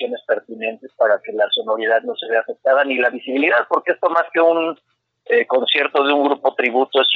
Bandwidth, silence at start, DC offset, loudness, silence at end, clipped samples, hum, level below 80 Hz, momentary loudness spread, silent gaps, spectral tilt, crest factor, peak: 5.2 kHz; 0 s; under 0.1%; -18 LUFS; 0 s; under 0.1%; none; -78 dBFS; 7 LU; none; -4.5 dB/octave; 16 dB; -2 dBFS